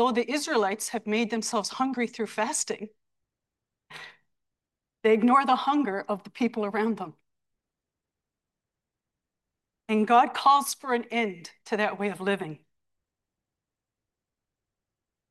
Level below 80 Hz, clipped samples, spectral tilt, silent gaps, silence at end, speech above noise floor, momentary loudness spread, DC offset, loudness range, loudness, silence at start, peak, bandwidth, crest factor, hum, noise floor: -80 dBFS; under 0.1%; -3.5 dB/octave; none; 2.75 s; 63 dB; 15 LU; under 0.1%; 9 LU; -26 LUFS; 0 s; -8 dBFS; 12.5 kHz; 20 dB; none; -88 dBFS